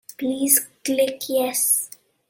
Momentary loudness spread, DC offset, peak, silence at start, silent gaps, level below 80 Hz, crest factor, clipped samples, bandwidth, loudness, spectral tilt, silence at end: 8 LU; under 0.1%; -2 dBFS; 0.2 s; none; -70 dBFS; 22 dB; under 0.1%; 17 kHz; -20 LUFS; -1 dB/octave; 0.45 s